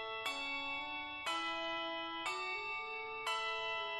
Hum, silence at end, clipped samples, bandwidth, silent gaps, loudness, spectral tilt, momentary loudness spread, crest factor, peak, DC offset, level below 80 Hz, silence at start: none; 0 s; under 0.1%; 12.5 kHz; none; -39 LUFS; -1 dB/octave; 3 LU; 16 dB; -26 dBFS; under 0.1%; -74 dBFS; 0 s